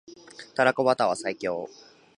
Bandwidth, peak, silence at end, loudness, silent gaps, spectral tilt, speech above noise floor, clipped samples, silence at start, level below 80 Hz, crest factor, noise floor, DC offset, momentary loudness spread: 11 kHz; -6 dBFS; 0.5 s; -26 LUFS; none; -4.5 dB/octave; 22 dB; under 0.1%; 0.1 s; -72 dBFS; 22 dB; -47 dBFS; under 0.1%; 21 LU